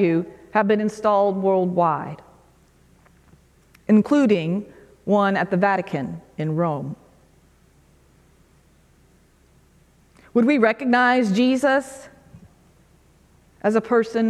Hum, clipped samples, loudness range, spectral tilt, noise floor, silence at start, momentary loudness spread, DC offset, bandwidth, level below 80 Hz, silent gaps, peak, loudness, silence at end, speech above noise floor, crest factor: none; under 0.1%; 9 LU; -7 dB/octave; -56 dBFS; 0 s; 17 LU; under 0.1%; 12 kHz; -60 dBFS; none; -4 dBFS; -20 LUFS; 0 s; 37 dB; 20 dB